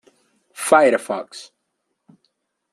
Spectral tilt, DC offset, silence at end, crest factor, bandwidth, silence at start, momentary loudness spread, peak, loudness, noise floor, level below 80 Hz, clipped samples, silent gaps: -3 dB/octave; under 0.1%; 1.3 s; 20 dB; 13.5 kHz; 0.55 s; 22 LU; -2 dBFS; -18 LUFS; -75 dBFS; -74 dBFS; under 0.1%; none